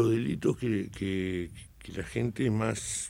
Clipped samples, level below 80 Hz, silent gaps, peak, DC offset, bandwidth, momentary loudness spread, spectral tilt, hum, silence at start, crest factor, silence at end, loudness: under 0.1%; -52 dBFS; none; -14 dBFS; under 0.1%; 16 kHz; 12 LU; -5.5 dB/octave; none; 0 s; 16 dB; 0 s; -31 LUFS